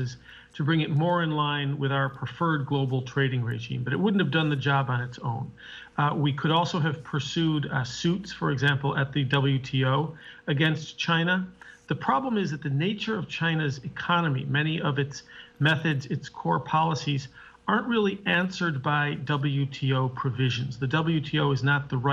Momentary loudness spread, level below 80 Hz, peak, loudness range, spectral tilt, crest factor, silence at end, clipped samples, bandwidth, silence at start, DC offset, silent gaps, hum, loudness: 8 LU; -60 dBFS; -8 dBFS; 1 LU; -6.5 dB/octave; 18 dB; 0 s; under 0.1%; 7.6 kHz; 0 s; under 0.1%; none; none; -27 LUFS